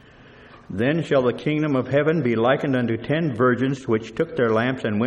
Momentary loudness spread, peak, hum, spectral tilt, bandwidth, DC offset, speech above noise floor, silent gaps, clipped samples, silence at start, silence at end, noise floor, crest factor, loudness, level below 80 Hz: 5 LU; -6 dBFS; none; -7.5 dB/octave; 9.4 kHz; under 0.1%; 26 dB; none; under 0.1%; 0.55 s; 0 s; -47 dBFS; 16 dB; -22 LUFS; -56 dBFS